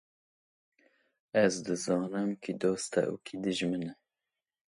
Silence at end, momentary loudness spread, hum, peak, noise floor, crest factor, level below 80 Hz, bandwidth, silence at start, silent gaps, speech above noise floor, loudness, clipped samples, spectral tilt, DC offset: 0.85 s; 7 LU; none; -12 dBFS; -90 dBFS; 22 dB; -74 dBFS; 11.5 kHz; 1.35 s; none; 59 dB; -32 LUFS; under 0.1%; -5 dB/octave; under 0.1%